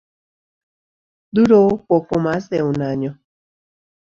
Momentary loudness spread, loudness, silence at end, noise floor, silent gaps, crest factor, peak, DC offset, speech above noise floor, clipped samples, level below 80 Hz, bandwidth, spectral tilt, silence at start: 11 LU; -17 LUFS; 1.05 s; under -90 dBFS; none; 18 dB; -2 dBFS; under 0.1%; over 74 dB; under 0.1%; -52 dBFS; 7.6 kHz; -8.5 dB/octave; 1.35 s